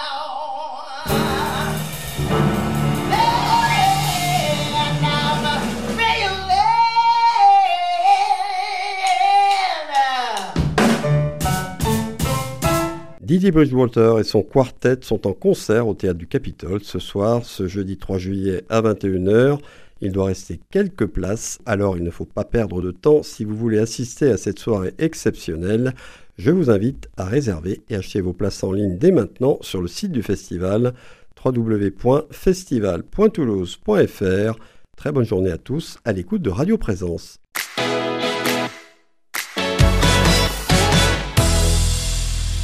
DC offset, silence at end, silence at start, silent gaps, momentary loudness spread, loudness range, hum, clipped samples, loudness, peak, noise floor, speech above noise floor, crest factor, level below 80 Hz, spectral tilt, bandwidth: 0.5%; 0 s; 0 s; none; 10 LU; 6 LU; none; under 0.1%; -19 LUFS; -2 dBFS; -54 dBFS; 34 dB; 18 dB; -32 dBFS; -5 dB/octave; 15.5 kHz